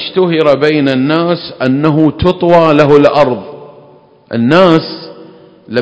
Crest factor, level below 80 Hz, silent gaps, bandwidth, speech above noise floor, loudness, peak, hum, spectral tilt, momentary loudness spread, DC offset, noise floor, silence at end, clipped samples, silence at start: 10 dB; -38 dBFS; none; 8 kHz; 33 dB; -10 LUFS; 0 dBFS; none; -7.5 dB/octave; 13 LU; under 0.1%; -41 dBFS; 0 s; 2%; 0 s